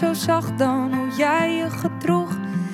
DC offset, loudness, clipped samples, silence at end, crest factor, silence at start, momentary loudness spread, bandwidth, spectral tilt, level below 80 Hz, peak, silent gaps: under 0.1%; -22 LUFS; under 0.1%; 0 s; 14 dB; 0 s; 6 LU; 17 kHz; -6 dB/octave; -62 dBFS; -6 dBFS; none